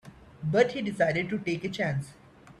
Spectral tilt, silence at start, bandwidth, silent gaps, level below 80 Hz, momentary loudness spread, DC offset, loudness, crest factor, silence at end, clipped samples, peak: -6.5 dB/octave; 0.05 s; 12.5 kHz; none; -60 dBFS; 10 LU; under 0.1%; -28 LUFS; 20 dB; 0.1 s; under 0.1%; -8 dBFS